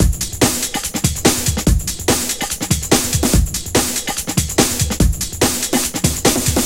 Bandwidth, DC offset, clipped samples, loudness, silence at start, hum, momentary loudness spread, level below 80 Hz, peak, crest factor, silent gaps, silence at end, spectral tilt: 17 kHz; 0.7%; under 0.1%; -16 LUFS; 0 s; none; 4 LU; -24 dBFS; 0 dBFS; 16 dB; none; 0 s; -3.5 dB/octave